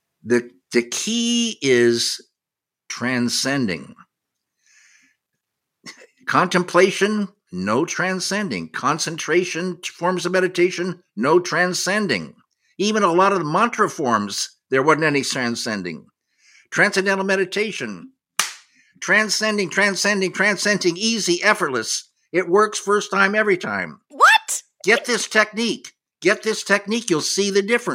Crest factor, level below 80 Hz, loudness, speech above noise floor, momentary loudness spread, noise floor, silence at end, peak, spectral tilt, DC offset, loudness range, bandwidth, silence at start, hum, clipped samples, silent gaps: 20 dB; -72 dBFS; -19 LUFS; 67 dB; 10 LU; -87 dBFS; 0 s; 0 dBFS; -3 dB/octave; under 0.1%; 4 LU; 16 kHz; 0.25 s; none; under 0.1%; none